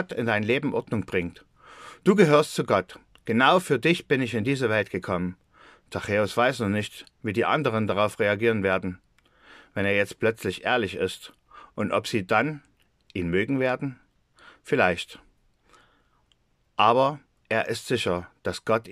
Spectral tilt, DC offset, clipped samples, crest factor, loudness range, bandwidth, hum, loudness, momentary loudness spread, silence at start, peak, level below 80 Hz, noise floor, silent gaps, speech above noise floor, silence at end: -5.5 dB/octave; under 0.1%; under 0.1%; 22 dB; 5 LU; 15 kHz; none; -25 LUFS; 16 LU; 0 s; -4 dBFS; -62 dBFS; -67 dBFS; none; 43 dB; 0 s